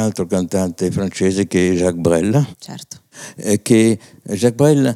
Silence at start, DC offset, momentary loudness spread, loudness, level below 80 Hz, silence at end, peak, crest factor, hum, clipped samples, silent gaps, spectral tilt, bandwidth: 0 s; under 0.1%; 19 LU; -17 LUFS; -54 dBFS; 0 s; 0 dBFS; 16 dB; none; under 0.1%; none; -6 dB/octave; 15.5 kHz